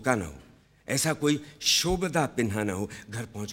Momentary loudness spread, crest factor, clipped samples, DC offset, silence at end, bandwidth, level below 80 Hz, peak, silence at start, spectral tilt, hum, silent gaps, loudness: 14 LU; 22 dB; under 0.1%; under 0.1%; 0 s; 17.5 kHz; -50 dBFS; -6 dBFS; 0 s; -3.5 dB/octave; none; none; -27 LUFS